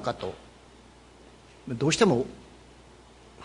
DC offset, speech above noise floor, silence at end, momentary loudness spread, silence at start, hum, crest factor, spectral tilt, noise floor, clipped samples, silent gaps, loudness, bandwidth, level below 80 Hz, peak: under 0.1%; 27 dB; 0 s; 25 LU; 0 s; none; 24 dB; -5 dB/octave; -53 dBFS; under 0.1%; none; -27 LUFS; 11 kHz; -56 dBFS; -8 dBFS